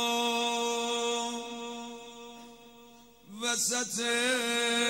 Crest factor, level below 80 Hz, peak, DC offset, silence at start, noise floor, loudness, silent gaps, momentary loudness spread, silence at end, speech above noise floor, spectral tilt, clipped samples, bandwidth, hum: 16 dB; -74 dBFS; -16 dBFS; under 0.1%; 0 s; -55 dBFS; -30 LUFS; none; 19 LU; 0 s; 26 dB; -0.5 dB/octave; under 0.1%; 16 kHz; none